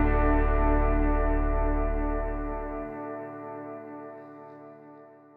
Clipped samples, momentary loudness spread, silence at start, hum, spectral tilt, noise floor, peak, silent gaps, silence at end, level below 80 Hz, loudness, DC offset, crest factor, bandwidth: under 0.1%; 21 LU; 0 s; none; -11 dB/octave; -50 dBFS; -12 dBFS; none; 0.3 s; -30 dBFS; -29 LUFS; under 0.1%; 16 dB; 3.2 kHz